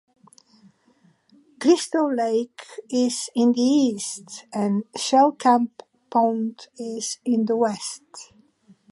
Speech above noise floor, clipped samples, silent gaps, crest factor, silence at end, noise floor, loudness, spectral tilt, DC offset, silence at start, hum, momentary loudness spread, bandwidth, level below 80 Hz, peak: 38 dB; under 0.1%; none; 18 dB; 0.65 s; -60 dBFS; -22 LUFS; -4.5 dB/octave; under 0.1%; 1.6 s; none; 15 LU; 11.5 kHz; -76 dBFS; -4 dBFS